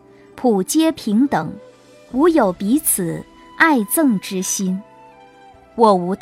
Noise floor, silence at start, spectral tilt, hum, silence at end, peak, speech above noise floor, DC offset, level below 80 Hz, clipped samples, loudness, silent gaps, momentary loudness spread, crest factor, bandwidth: -46 dBFS; 0.35 s; -4.5 dB/octave; none; 0.05 s; 0 dBFS; 29 dB; under 0.1%; -54 dBFS; under 0.1%; -17 LUFS; none; 11 LU; 18 dB; 16 kHz